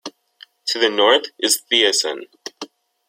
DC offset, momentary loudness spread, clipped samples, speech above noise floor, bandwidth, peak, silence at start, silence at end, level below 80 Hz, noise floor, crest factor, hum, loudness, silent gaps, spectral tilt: under 0.1%; 22 LU; under 0.1%; 31 dB; 16.5 kHz; -2 dBFS; 0.05 s; 0.45 s; -74 dBFS; -49 dBFS; 20 dB; none; -17 LUFS; none; 0.5 dB/octave